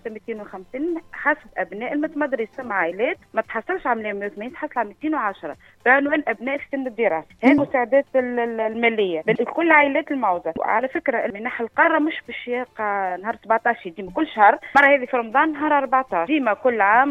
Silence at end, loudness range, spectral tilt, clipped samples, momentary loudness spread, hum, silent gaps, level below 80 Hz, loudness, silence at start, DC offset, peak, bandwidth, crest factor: 0 s; 6 LU; -6.5 dB/octave; under 0.1%; 12 LU; none; none; -60 dBFS; -21 LUFS; 0.05 s; under 0.1%; -2 dBFS; 7.8 kHz; 18 dB